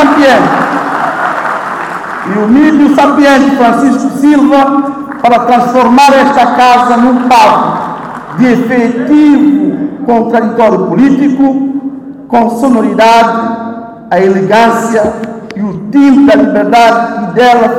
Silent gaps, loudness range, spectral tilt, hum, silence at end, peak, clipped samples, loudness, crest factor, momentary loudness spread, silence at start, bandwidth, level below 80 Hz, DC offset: none; 3 LU; -5.5 dB/octave; none; 0 s; 0 dBFS; 2%; -7 LUFS; 6 dB; 12 LU; 0 s; 14 kHz; -44 dBFS; under 0.1%